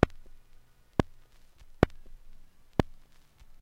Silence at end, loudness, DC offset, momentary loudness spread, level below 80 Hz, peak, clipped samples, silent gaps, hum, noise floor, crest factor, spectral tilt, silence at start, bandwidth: 0.75 s; -32 LUFS; under 0.1%; 11 LU; -44 dBFS; -2 dBFS; under 0.1%; none; none; -55 dBFS; 30 dB; -7.5 dB/octave; 0 s; 16.5 kHz